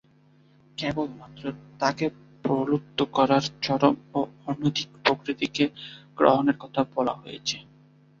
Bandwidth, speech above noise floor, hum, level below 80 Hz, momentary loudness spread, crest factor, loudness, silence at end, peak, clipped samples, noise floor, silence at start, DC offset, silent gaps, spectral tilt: 7.6 kHz; 33 dB; none; -62 dBFS; 14 LU; 24 dB; -26 LUFS; 0.6 s; -2 dBFS; under 0.1%; -58 dBFS; 0.8 s; under 0.1%; none; -5.5 dB/octave